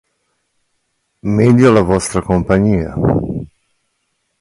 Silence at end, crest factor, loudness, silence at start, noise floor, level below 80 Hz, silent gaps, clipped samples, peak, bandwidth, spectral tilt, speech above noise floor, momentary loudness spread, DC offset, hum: 0.95 s; 16 dB; -13 LUFS; 1.25 s; -68 dBFS; -34 dBFS; none; under 0.1%; 0 dBFS; 11.5 kHz; -7 dB/octave; 56 dB; 16 LU; under 0.1%; none